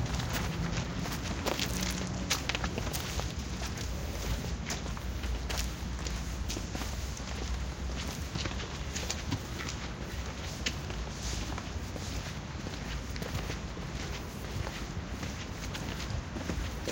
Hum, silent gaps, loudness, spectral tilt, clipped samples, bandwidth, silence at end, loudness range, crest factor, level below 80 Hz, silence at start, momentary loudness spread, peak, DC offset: none; none; -36 LUFS; -4 dB/octave; under 0.1%; 17 kHz; 0 s; 4 LU; 26 dB; -40 dBFS; 0 s; 6 LU; -10 dBFS; under 0.1%